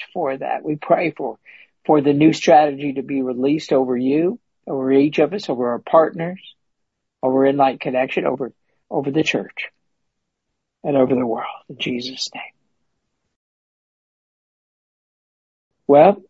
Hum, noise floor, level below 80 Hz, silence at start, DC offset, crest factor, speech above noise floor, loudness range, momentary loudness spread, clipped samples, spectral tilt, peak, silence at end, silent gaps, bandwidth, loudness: none; -78 dBFS; -66 dBFS; 0 s; under 0.1%; 20 dB; 60 dB; 9 LU; 16 LU; under 0.1%; -6 dB/octave; 0 dBFS; 0.1 s; 13.36-15.71 s; 8 kHz; -19 LUFS